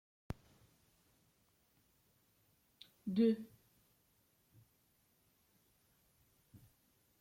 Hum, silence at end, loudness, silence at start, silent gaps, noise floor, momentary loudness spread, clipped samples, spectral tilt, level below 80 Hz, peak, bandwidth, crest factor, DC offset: none; 3.75 s; -37 LUFS; 0.3 s; none; -76 dBFS; 18 LU; under 0.1%; -8 dB/octave; -70 dBFS; -24 dBFS; 16 kHz; 22 dB; under 0.1%